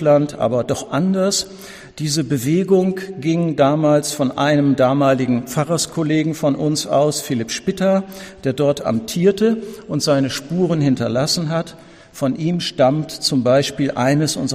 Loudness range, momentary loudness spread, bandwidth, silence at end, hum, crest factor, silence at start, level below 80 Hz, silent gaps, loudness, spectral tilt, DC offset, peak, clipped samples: 3 LU; 7 LU; 15.5 kHz; 0 s; none; 14 dB; 0 s; -52 dBFS; none; -18 LUFS; -5.5 dB/octave; under 0.1%; -2 dBFS; under 0.1%